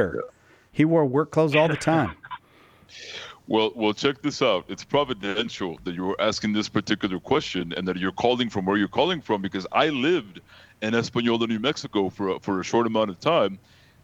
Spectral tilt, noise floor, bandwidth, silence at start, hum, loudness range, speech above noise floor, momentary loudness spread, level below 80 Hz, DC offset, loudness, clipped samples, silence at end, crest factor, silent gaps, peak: -5.5 dB/octave; -55 dBFS; 10.5 kHz; 0 s; none; 2 LU; 31 dB; 11 LU; -58 dBFS; under 0.1%; -24 LUFS; under 0.1%; 0.45 s; 20 dB; none; -6 dBFS